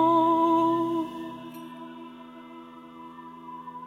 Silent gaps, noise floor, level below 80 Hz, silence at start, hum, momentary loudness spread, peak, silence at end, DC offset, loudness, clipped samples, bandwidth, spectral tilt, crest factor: none; -45 dBFS; -70 dBFS; 0 s; none; 23 LU; -12 dBFS; 0 s; under 0.1%; -24 LUFS; under 0.1%; 14 kHz; -7 dB/octave; 16 dB